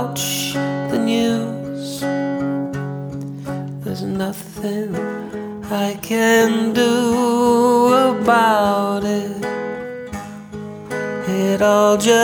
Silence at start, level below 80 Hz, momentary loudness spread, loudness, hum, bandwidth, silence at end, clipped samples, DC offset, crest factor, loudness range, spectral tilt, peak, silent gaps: 0 s; -52 dBFS; 15 LU; -18 LUFS; none; over 20 kHz; 0 s; under 0.1%; under 0.1%; 16 dB; 9 LU; -4.5 dB/octave; -2 dBFS; none